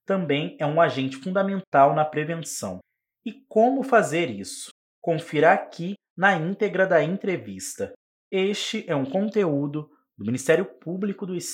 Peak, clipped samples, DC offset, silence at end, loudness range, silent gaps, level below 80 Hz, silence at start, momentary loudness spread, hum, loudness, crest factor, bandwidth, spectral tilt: -4 dBFS; under 0.1%; under 0.1%; 0 s; 3 LU; 1.67-1.72 s, 4.71-5.02 s, 6.10-6.16 s, 7.96-8.31 s; -76 dBFS; 0.1 s; 15 LU; none; -24 LUFS; 20 dB; 16.5 kHz; -5 dB/octave